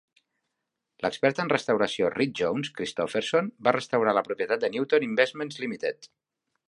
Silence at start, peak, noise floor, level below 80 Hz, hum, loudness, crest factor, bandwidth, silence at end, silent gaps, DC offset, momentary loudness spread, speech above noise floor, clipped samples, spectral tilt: 1 s; -6 dBFS; -83 dBFS; -68 dBFS; none; -27 LUFS; 22 dB; 11.5 kHz; 0.6 s; none; under 0.1%; 8 LU; 57 dB; under 0.1%; -5 dB/octave